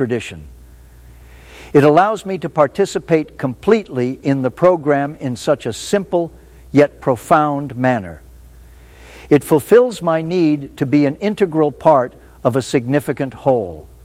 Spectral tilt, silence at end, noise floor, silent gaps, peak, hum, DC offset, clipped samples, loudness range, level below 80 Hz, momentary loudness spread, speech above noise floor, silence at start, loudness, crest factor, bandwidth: -6.5 dB/octave; 0.25 s; -41 dBFS; none; 0 dBFS; none; under 0.1%; under 0.1%; 2 LU; -46 dBFS; 10 LU; 26 dB; 0 s; -16 LUFS; 16 dB; 16 kHz